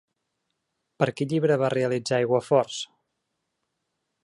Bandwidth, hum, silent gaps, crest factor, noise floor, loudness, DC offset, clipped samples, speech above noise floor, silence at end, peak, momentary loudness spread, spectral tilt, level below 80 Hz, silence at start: 11.5 kHz; none; none; 20 dB; -79 dBFS; -24 LUFS; under 0.1%; under 0.1%; 56 dB; 1.4 s; -6 dBFS; 9 LU; -5.5 dB/octave; -70 dBFS; 1 s